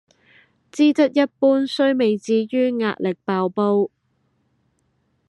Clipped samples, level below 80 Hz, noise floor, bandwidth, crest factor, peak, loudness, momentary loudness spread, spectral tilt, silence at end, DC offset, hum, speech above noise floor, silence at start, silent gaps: under 0.1%; -74 dBFS; -67 dBFS; 11 kHz; 16 dB; -4 dBFS; -20 LUFS; 6 LU; -6 dB/octave; 1.4 s; under 0.1%; none; 48 dB; 0.75 s; none